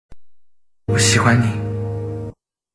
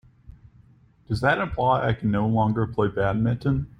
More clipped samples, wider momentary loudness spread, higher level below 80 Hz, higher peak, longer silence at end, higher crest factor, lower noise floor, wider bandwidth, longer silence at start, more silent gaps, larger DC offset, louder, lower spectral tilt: neither; first, 18 LU vs 3 LU; about the same, -44 dBFS vs -44 dBFS; first, -2 dBFS vs -8 dBFS; first, 0.45 s vs 0.1 s; about the same, 18 dB vs 16 dB; about the same, -52 dBFS vs -55 dBFS; about the same, 11 kHz vs 10.5 kHz; second, 0.1 s vs 0.3 s; neither; neither; first, -18 LUFS vs -24 LUFS; second, -4.5 dB/octave vs -8.5 dB/octave